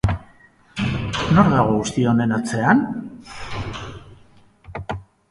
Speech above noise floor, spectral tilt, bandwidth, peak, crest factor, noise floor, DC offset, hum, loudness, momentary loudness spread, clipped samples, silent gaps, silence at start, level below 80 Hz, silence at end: 34 dB; -6.5 dB/octave; 11.5 kHz; -2 dBFS; 20 dB; -51 dBFS; under 0.1%; none; -20 LUFS; 19 LU; under 0.1%; none; 0.05 s; -38 dBFS; 0.3 s